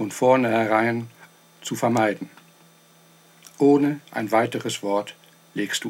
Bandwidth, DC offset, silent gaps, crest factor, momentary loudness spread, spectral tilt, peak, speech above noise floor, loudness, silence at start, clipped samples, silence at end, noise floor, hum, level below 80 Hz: 16.5 kHz; under 0.1%; none; 18 dB; 17 LU; -5 dB/octave; -4 dBFS; 33 dB; -22 LUFS; 0 s; under 0.1%; 0 s; -54 dBFS; none; -76 dBFS